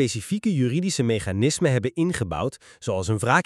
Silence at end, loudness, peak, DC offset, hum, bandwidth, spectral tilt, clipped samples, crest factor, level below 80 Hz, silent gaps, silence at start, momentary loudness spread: 0.05 s; -24 LUFS; -4 dBFS; under 0.1%; none; 13 kHz; -5.5 dB/octave; under 0.1%; 20 dB; -50 dBFS; none; 0 s; 8 LU